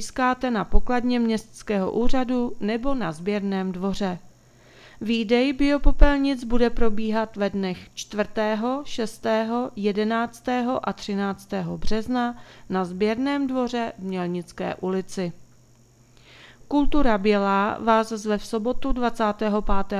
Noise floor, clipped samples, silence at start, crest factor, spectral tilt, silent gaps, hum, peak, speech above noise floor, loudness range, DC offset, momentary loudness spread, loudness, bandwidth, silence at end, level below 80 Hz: -55 dBFS; under 0.1%; 0 s; 22 dB; -6 dB/octave; none; none; 0 dBFS; 33 dB; 4 LU; under 0.1%; 9 LU; -25 LUFS; 11.5 kHz; 0 s; -32 dBFS